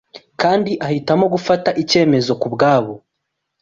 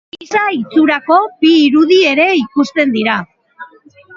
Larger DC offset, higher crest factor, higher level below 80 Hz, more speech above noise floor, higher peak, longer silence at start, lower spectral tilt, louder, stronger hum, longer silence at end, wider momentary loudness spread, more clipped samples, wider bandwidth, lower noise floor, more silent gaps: neither; about the same, 14 dB vs 12 dB; about the same, -56 dBFS vs -60 dBFS; first, 60 dB vs 30 dB; about the same, -2 dBFS vs 0 dBFS; about the same, 0.15 s vs 0.2 s; about the same, -5.5 dB/octave vs -4.5 dB/octave; second, -16 LUFS vs -12 LUFS; neither; first, 0.65 s vs 0.5 s; about the same, 6 LU vs 7 LU; neither; about the same, 7.8 kHz vs 7.2 kHz; first, -76 dBFS vs -42 dBFS; neither